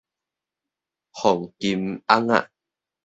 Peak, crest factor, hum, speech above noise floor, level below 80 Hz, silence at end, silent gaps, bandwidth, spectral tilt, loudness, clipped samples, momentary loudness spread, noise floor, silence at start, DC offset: 0 dBFS; 24 dB; none; 66 dB; -62 dBFS; 0.6 s; none; 8.2 kHz; -5 dB/octave; -22 LUFS; under 0.1%; 7 LU; -87 dBFS; 1.15 s; under 0.1%